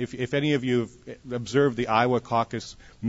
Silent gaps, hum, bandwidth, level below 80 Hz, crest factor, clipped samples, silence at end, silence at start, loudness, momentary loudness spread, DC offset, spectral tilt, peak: none; none; 8 kHz; -56 dBFS; 20 dB; under 0.1%; 0 s; 0 s; -25 LUFS; 13 LU; under 0.1%; -6 dB/octave; -6 dBFS